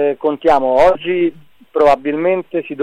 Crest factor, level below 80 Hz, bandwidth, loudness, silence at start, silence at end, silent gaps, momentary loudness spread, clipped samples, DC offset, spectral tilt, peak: 12 dB; -42 dBFS; 10.5 kHz; -15 LUFS; 0 s; 0 s; none; 8 LU; under 0.1%; under 0.1%; -6.5 dB/octave; -2 dBFS